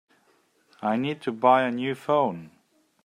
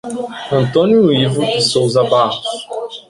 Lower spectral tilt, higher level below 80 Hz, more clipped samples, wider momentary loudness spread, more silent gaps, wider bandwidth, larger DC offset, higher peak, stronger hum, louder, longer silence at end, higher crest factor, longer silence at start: first, -7 dB/octave vs -5.5 dB/octave; second, -74 dBFS vs -52 dBFS; neither; second, 10 LU vs 13 LU; neither; first, 13 kHz vs 11.5 kHz; neither; second, -6 dBFS vs 0 dBFS; neither; second, -25 LUFS vs -14 LUFS; first, 0.55 s vs 0.1 s; first, 20 dB vs 14 dB; first, 0.8 s vs 0.05 s